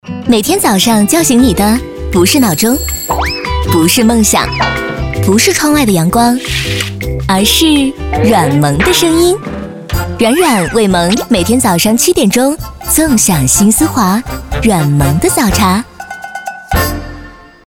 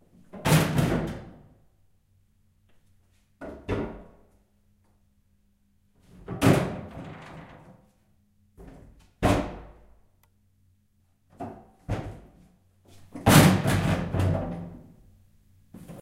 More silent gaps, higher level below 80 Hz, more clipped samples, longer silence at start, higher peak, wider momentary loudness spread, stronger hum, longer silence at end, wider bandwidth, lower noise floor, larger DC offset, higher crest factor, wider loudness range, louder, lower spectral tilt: neither; first, -26 dBFS vs -46 dBFS; neither; second, 0.05 s vs 0.35 s; first, 0 dBFS vs -4 dBFS; second, 9 LU vs 26 LU; neither; first, 0.3 s vs 0 s; first, 19 kHz vs 16 kHz; second, -32 dBFS vs -67 dBFS; first, 0.4% vs under 0.1%; second, 10 dB vs 26 dB; second, 1 LU vs 16 LU; first, -10 LUFS vs -25 LUFS; second, -4 dB/octave vs -5.5 dB/octave